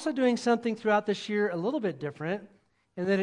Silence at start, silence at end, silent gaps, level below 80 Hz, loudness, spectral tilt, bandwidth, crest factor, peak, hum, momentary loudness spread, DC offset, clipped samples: 0 s; 0 s; none; -76 dBFS; -29 LUFS; -6 dB/octave; 11 kHz; 18 dB; -12 dBFS; none; 9 LU; under 0.1%; under 0.1%